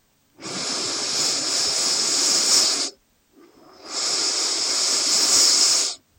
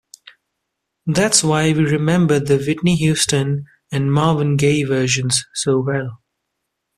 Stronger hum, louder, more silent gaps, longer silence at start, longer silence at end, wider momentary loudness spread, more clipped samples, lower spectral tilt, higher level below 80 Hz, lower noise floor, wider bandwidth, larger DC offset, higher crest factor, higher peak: neither; about the same, -18 LUFS vs -17 LUFS; neither; second, 0.4 s vs 1.05 s; second, 0.2 s vs 0.8 s; first, 12 LU vs 9 LU; neither; second, 1.5 dB/octave vs -4.5 dB/octave; second, -70 dBFS vs -50 dBFS; second, -56 dBFS vs -77 dBFS; first, 16.5 kHz vs 14 kHz; neither; about the same, 18 dB vs 18 dB; second, -4 dBFS vs 0 dBFS